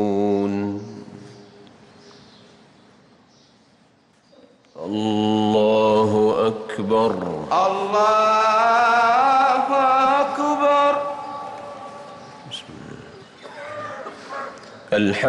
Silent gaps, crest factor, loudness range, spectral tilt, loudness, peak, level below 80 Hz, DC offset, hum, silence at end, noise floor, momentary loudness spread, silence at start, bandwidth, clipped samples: none; 12 dB; 18 LU; -5.5 dB/octave; -19 LUFS; -8 dBFS; -64 dBFS; under 0.1%; none; 0 s; -57 dBFS; 22 LU; 0 s; 11 kHz; under 0.1%